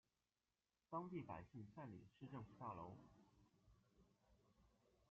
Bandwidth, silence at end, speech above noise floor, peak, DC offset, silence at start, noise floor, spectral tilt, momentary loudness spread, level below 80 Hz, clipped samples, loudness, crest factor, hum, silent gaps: 7 kHz; 0.4 s; over 35 dB; -36 dBFS; under 0.1%; 0.9 s; under -90 dBFS; -7.5 dB/octave; 9 LU; -82 dBFS; under 0.1%; -56 LUFS; 22 dB; none; none